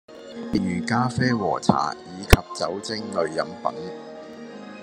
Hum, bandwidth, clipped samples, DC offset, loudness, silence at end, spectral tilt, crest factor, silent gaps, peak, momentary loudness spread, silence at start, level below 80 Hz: none; 13.5 kHz; under 0.1%; under 0.1%; -24 LUFS; 0 s; -5.5 dB/octave; 24 dB; none; 0 dBFS; 19 LU; 0.1 s; -34 dBFS